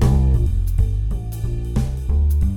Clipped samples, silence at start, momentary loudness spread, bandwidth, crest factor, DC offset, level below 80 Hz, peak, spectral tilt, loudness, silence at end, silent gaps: under 0.1%; 0 s; 8 LU; 16 kHz; 14 dB; under 0.1%; -20 dBFS; -4 dBFS; -8 dB/octave; -21 LUFS; 0 s; none